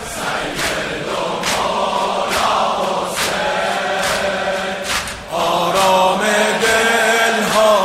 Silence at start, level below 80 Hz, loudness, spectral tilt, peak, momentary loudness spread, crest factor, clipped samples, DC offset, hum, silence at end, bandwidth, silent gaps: 0 s; -44 dBFS; -16 LUFS; -2.5 dB/octave; -2 dBFS; 8 LU; 14 dB; under 0.1%; under 0.1%; none; 0 s; 16 kHz; none